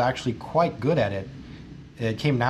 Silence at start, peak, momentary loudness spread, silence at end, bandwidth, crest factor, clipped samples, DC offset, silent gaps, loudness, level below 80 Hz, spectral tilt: 0 s; -8 dBFS; 19 LU; 0 s; 12.5 kHz; 18 dB; under 0.1%; under 0.1%; none; -26 LUFS; -50 dBFS; -7 dB/octave